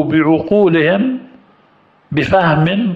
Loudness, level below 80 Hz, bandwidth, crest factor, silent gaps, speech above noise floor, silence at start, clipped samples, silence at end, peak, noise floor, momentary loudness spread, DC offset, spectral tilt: -13 LUFS; -46 dBFS; 7.6 kHz; 12 dB; none; 39 dB; 0 s; under 0.1%; 0 s; -2 dBFS; -51 dBFS; 8 LU; under 0.1%; -8.5 dB/octave